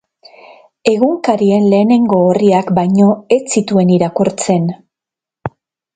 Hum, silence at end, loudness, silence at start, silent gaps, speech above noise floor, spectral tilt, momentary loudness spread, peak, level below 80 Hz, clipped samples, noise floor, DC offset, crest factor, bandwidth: none; 0.45 s; -12 LUFS; 0.85 s; none; 75 dB; -6.5 dB/octave; 13 LU; 0 dBFS; -54 dBFS; under 0.1%; -86 dBFS; under 0.1%; 14 dB; 9.4 kHz